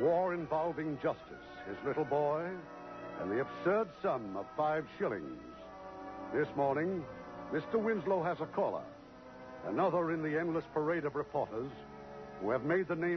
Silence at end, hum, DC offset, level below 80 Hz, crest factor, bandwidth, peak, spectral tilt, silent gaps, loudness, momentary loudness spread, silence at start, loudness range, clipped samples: 0 s; none; under 0.1%; -66 dBFS; 16 dB; 6.2 kHz; -20 dBFS; -6 dB/octave; none; -36 LUFS; 16 LU; 0 s; 2 LU; under 0.1%